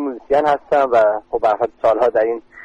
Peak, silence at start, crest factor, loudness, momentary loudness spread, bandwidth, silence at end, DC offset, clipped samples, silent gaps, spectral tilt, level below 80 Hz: -6 dBFS; 0 s; 12 dB; -17 LUFS; 4 LU; 8.2 kHz; 0 s; under 0.1%; under 0.1%; none; -6 dB/octave; -52 dBFS